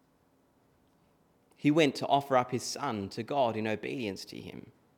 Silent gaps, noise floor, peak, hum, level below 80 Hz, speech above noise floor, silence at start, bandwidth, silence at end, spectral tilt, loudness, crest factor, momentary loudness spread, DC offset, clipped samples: none; -68 dBFS; -10 dBFS; none; -76 dBFS; 38 dB; 1.6 s; 18.5 kHz; 0.25 s; -5 dB/octave; -31 LUFS; 22 dB; 17 LU; under 0.1%; under 0.1%